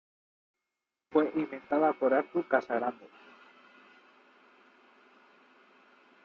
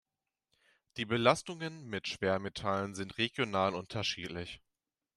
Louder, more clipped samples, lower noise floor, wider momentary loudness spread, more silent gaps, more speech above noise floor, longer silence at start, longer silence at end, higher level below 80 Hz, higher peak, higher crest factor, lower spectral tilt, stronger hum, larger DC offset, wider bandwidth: first, -30 LUFS vs -34 LUFS; neither; about the same, -88 dBFS vs -89 dBFS; second, 8 LU vs 13 LU; neither; first, 59 dB vs 54 dB; first, 1.1 s vs 0.95 s; first, 3.2 s vs 0.6 s; second, -80 dBFS vs -68 dBFS; about the same, -12 dBFS vs -12 dBFS; about the same, 22 dB vs 24 dB; about the same, -4.5 dB/octave vs -4.5 dB/octave; neither; neither; second, 6.4 kHz vs 13 kHz